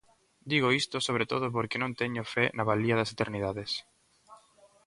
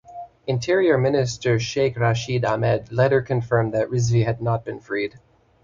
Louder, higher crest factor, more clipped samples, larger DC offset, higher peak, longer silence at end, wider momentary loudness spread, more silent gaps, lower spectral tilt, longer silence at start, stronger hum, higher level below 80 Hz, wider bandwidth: second, -30 LUFS vs -22 LUFS; about the same, 20 dB vs 16 dB; neither; neither; second, -10 dBFS vs -6 dBFS; about the same, 0.5 s vs 0.45 s; about the same, 7 LU vs 8 LU; neither; about the same, -5 dB/octave vs -6 dB/octave; first, 0.45 s vs 0.1 s; neither; second, -62 dBFS vs -50 dBFS; first, 11.5 kHz vs 7.6 kHz